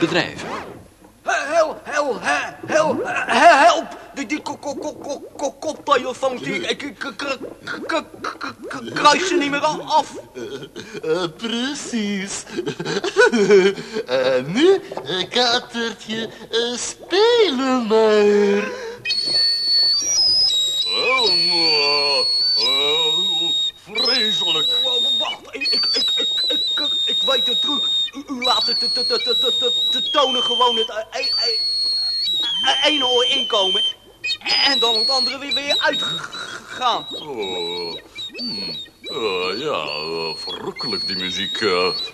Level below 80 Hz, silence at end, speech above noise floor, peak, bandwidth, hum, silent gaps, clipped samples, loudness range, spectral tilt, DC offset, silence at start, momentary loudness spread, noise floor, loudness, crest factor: -58 dBFS; 0 s; 25 dB; 0 dBFS; 13.5 kHz; none; none; under 0.1%; 9 LU; -2 dB/octave; under 0.1%; 0 s; 14 LU; -45 dBFS; -18 LUFS; 20 dB